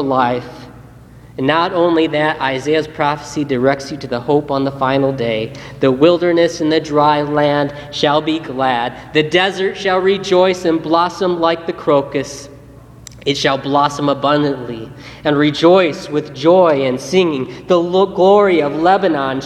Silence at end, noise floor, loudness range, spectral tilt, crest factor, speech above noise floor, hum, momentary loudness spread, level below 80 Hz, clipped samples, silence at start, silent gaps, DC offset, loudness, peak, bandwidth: 0 s; -39 dBFS; 4 LU; -5.5 dB/octave; 14 dB; 24 dB; none; 10 LU; -48 dBFS; under 0.1%; 0 s; none; under 0.1%; -15 LUFS; 0 dBFS; 12.5 kHz